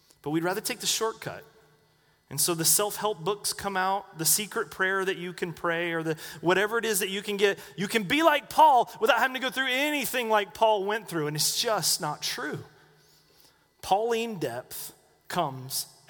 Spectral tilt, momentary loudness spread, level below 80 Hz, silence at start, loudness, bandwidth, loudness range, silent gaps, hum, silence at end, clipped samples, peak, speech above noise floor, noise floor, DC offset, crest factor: -2.5 dB/octave; 11 LU; -66 dBFS; 0.25 s; -26 LUFS; over 20 kHz; 6 LU; none; none; 0.2 s; under 0.1%; -6 dBFS; 38 dB; -65 dBFS; under 0.1%; 22 dB